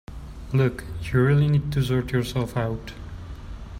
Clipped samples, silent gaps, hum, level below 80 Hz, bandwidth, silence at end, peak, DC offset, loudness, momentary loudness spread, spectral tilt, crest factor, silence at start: under 0.1%; none; none; -40 dBFS; 15 kHz; 0 s; -10 dBFS; under 0.1%; -24 LUFS; 19 LU; -7.5 dB/octave; 14 dB; 0.1 s